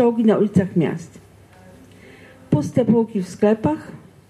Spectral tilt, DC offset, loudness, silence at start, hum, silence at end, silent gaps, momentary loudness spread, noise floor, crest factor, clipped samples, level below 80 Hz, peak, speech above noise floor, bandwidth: -8.5 dB/octave; under 0.1%; -19 LUFS; 0 s; none; 0.3 s; none; 10 LU; -46 dBFS; 16 dB; under 0.1%; -58 dBFS; -4 dBFS; 27 dB; 11.5 kHz